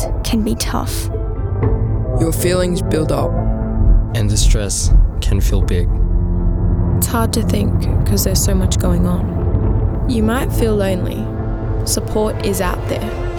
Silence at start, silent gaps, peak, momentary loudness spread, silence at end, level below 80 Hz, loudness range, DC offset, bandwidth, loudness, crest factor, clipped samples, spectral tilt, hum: 0 s; none; -2 dBFS; 6 LU; 0 s; -18 dBFS; 2 LU; under 0.1%; 20 kHz; -17 LUFS; 12 dB; under 0.1%; -5.5 dB/octave; none